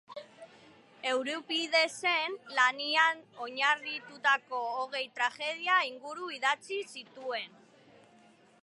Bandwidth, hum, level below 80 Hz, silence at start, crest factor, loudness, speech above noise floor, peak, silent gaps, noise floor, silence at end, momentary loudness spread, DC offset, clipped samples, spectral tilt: 11.5 kHz; none; under -90 dBFS; 0.1 s; 22 dB; -30 LUFS; 29 dB; -12 dBFS; none; -61 dBFS; 1.15 s; 13 LU; under 0.1%; under 0.1%; -0.5 dB/octave